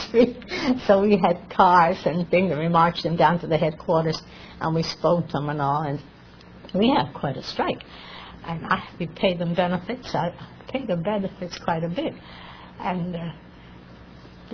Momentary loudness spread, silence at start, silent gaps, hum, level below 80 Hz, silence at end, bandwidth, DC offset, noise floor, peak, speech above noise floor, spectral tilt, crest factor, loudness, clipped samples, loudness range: 15 LU; 0 s; none; none; -50 dBFS; 0.05 s; 5.4 kHz; under 0.1%; -46 dBFS; -2 dBFS; 24 dB; -7 dB/octave; 22 dB; -23 LUFS; under 0.1%; 9 LU